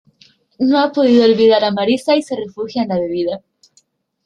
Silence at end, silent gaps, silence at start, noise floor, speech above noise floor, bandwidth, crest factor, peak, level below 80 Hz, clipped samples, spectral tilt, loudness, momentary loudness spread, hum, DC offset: 0.9 s; none; 0.6 s; -58 dBFS; 44 dB; 11 kHz; 14 dB; -2 dBFS; -60 dBFS; under 0.1%; -6 dB/octave; -15 LUFS; 12 LU; none; under 0.1%